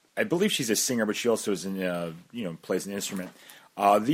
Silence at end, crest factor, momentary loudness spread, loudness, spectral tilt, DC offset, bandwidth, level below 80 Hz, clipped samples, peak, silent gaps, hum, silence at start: 0 s; 20 dB; 12 LU; -28 LUFS; -3.5 dB/octave; under 0.1%; 16.5 kHz; -72 dBFS; under 0.1%; -8 dBFS; none; none; 0.15 s